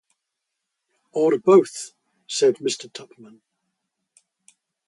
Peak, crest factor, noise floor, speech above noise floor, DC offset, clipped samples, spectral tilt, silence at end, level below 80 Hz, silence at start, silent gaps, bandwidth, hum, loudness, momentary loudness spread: -4 dBFS; 20 dB; -81 dBFS; 61 dB; under 0.1%; under 0.1%; -4.5 dB/octave; 1.9 s; -78 dBFS; 1.15 s; none; 11.5 kHz; none; -20 LUFS; 22 LU